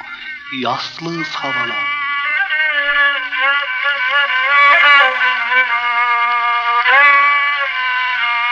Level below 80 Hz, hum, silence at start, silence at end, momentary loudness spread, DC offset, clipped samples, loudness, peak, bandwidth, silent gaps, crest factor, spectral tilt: -58 dBFS; none; 0 s; 0 s; 12 LU; under 0.1%; under 0.1%; -13 LUFS; -2 dBFS; 7.6 kHz; none; 14 dB; -2.5 dB/octave